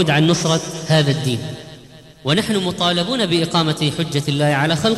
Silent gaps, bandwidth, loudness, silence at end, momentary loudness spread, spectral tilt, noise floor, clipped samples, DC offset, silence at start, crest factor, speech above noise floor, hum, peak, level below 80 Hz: none; 13.5 kHz; -18 LUFS; 0 s; 9 LU; -5 dB/octave; -42 dBFS; under 0.1%; under 0.1%; 0 s; 14 dB; 24 dB; none; -4 dBFS; -50 dBFS